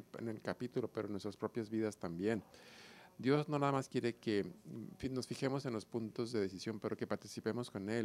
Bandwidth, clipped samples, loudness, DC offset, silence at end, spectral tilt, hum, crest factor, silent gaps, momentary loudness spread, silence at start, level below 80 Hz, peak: 15.5 kHz; under 0.1%; -40 LUFS; under 0.1%; 0 s; -6.5 dB/octave; none; 20 dB; none; 11 LU; 0 s; -74 dBFS; -20 dBFS